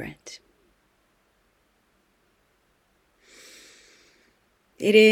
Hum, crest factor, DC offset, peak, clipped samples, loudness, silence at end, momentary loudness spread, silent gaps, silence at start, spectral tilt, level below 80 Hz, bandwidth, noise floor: none; 24 dB; under 0.1%; -4 dBFS; under 0.1%; -21 LUFS; 0 s; 31 LU; none; 0 s; -4.5 dB/octave; -68 dBFS; 15.5 kHz; -67 dBFS